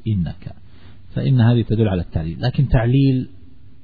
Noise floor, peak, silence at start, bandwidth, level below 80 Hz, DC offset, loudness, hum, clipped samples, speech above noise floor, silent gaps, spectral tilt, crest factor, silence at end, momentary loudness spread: -45 dBFS; -4 dBFS; 0.05 s; 4.9 kHz; -32 dBFS; 1%; -18 LUFS; none; under 0.1%; 28 dB; none; -11 dB/octave; 14 dB; 0.55 s; 15 LU